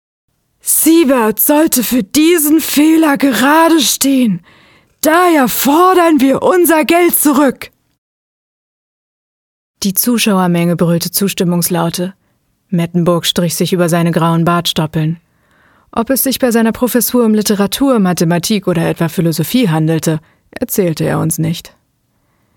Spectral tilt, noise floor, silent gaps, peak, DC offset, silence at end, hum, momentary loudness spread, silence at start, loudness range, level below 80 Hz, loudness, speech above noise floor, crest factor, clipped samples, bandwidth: -4.5 dB/octave; -60 dBFS; 7.98-9.74 s; 0 dBFS; under 0.1%; 0.9 s; none; 9 LU; 0.65 s; 5 LU; -48 dBFS; -11 LUFS; 49 dB; 12 dB; under 0.1%; 19.5 kHz